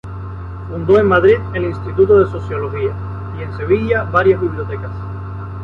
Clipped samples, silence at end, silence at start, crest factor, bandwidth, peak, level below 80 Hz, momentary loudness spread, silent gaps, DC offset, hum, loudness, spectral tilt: under 0.1%; 0 s; 0.05 s; 14 dB; 5.4 kHz; -2 dBFS; -34 dBFS; 16 LU; none; under 0.1%; none; -16 LUFS; -9 dB/octave